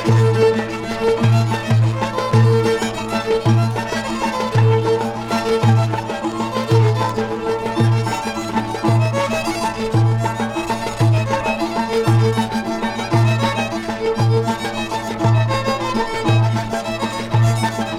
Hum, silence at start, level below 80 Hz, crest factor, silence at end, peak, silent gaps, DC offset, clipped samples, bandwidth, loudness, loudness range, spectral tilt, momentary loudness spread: none; 0 s; -42 dBFS; 14 dB; 0 s; -2 dBFS; none; under 0.1%; under 0.1%; 13 kHz; -18 LUFS; 2 LU; -6.5 dB/octave; 7 LU